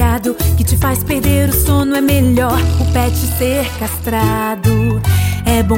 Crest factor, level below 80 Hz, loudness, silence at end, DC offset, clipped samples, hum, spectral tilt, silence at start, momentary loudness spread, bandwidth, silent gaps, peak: 12 dB; -24 dBFS; -14 LUFS; 0 s; under 0.1%; under 0.1%; none; -5.5 dB/octave; 0 s; 3 LU; 17 kHz; none; -2 dBFS